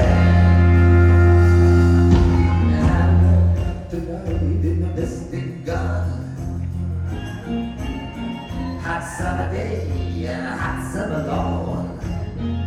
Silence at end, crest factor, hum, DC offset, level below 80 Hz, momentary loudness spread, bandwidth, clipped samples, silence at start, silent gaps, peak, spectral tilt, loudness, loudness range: 0 s; 14 dB; none; under 0.1%; -26 dBFS; 15 LU; 9.4 kHz; under 0.1%; 0 s; none; -2 dBFS; -8 dB/octave; -19 LUFS; 12 LU